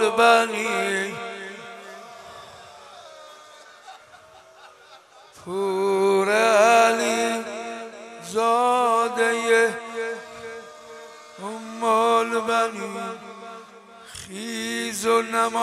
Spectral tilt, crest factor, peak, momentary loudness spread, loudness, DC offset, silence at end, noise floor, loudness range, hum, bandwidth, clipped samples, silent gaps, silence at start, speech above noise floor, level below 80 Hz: -2.5 dB/octave; 20 dB; -4 dBFS; 24 LU; -21 LUFS; under 0.1%; 0 s; -49 dBFS; 14 LU; none; 15.5 kHz; under 0.1%; none; 0 s; 28 dB; -70 dBFS